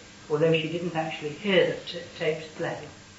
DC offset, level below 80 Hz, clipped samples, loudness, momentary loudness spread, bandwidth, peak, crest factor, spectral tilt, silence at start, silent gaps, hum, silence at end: under 0.1%; -64 dBFS; under 0.1%; -27 LUFS; 11 LU; 8 kHz; -8 dBFS; 20 dB; -5.5 dB/octave; 0 s; none; none; 0 s